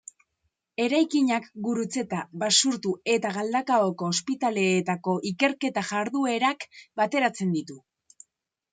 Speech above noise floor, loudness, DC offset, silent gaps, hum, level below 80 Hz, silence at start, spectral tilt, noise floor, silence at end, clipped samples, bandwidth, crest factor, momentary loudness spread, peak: 52 dB; -25 LUFS; under 0.1%; none; none; -74 dBFS; 0.8 s; -3.5 dB/octave; -78 dBFS; 0.95 s; under 0.1%; 9.6 kHz; 20 dB; 8 LU; -6 dBFS